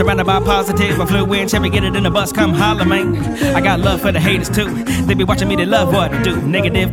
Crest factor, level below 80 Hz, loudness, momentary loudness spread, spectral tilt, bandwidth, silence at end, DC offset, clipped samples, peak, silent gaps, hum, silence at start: 14 dB; -28 dBFS; -15 LUFS; 3 LU; -5.5 dB/octave; 17.5 kHz; 0 s; under 0.1%; under 0.1%; 0 dBFS; none; none; 0 s